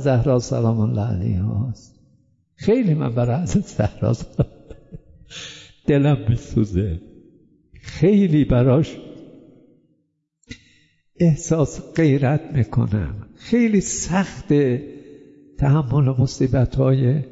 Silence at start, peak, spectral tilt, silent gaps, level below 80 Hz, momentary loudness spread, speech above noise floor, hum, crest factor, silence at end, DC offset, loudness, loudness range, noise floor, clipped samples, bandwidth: 0 s; -6 dBFS; -7 dB/octave; none; -40 dBFS; 12 LU; 51 dB; none; 14 dB; 0 s; under 0.1%; -20 LUFS; 3 LU; -69 dBFS; under 0.1%; 8 kHz